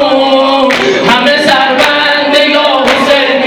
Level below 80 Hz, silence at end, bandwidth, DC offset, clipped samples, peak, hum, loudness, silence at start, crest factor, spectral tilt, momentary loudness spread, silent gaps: -44 dBFS; 0 s; 18.5 kHz; under 0.1%; 0.9%; 0 dBFS; none; -7 LUFS; 0 s; 8 dB; -3 dB/octave; 1 LU; none